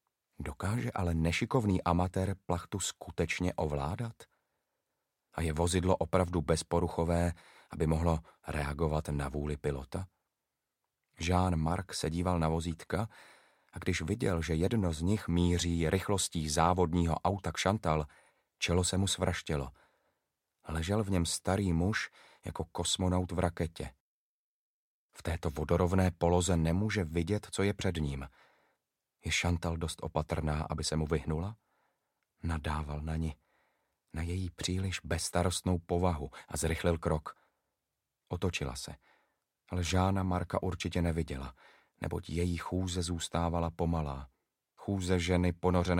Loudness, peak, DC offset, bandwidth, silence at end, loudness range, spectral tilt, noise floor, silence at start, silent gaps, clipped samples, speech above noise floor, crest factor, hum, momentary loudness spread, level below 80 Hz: -33 LUFS; -12 dBFS; under 0.1%; 16 kHz; 0 s; 5 LU; -5.5 dB/octave; -88 dBFS; 0.4 s; 24.00-25.09 s; under 0.1%; 56 dB; 22 dB; none; 11 LU; -46 dBFS